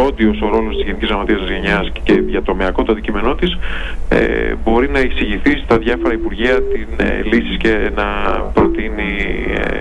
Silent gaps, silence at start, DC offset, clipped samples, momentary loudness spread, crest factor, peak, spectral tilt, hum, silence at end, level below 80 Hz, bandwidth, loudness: none; 0 s; under 0.1%; under 0.1%; 5 LU; 12 dB; -2 dBFS; -7 dB/octave; none; 0 s; -22 dBFS; 8.2 kHz; -16 LUFS